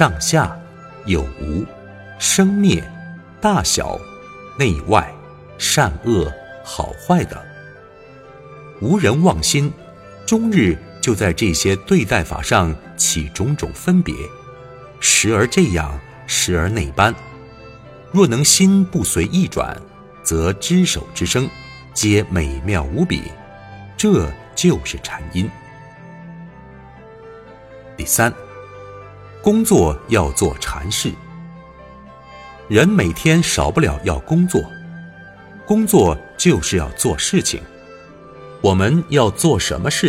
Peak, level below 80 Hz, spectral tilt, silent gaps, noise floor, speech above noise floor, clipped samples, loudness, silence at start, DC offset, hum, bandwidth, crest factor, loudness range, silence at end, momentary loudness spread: 0 dBFS; -34 dBFS; -4.5 dB/octave; none; -41 dBFS; 25 dB; under 0.1%; -17 LUFS; 0 s; under 0.1%; none; 16 kHz; 18 dB; 5 LU; 0 s; 23 LU